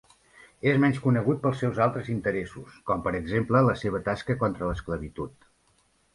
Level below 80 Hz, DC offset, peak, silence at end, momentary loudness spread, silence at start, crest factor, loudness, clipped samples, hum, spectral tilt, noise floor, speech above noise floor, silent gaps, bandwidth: -48 dBFS; under 0.1%; -8 dBFS; 0.85 s; 12 LU; 0.65 s; 18 dB; -26 LUFS; under 0.1%; none; -8 dB/octave; -66 dBFS; 40 dB; none; 11.5 kHz